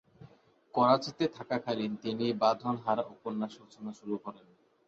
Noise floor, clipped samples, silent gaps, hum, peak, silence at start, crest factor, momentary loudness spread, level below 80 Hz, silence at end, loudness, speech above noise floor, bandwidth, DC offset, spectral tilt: -59 dBFS; under 0.1%; none; none; -12 dBFS; 0.2 s; 22 dB; 14 LU; -74 dBFS; 0.5 s; -32 LUFS; 27 dB; 7.8 kHz; under 0.1%; -6.5 dB/octave